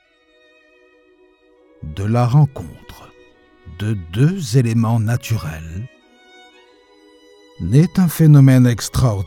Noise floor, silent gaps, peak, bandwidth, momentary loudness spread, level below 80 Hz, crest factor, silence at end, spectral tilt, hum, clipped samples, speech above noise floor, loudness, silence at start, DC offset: -55 dBFS; none; 0 dBFS; 16.5 kHz; 22 LU; -42 dBFS; 18 dB; 0 s; -7 dB/octave; none; under 0.1%; 40 dB; -15 LUFS; 1.8 s; under 0.1%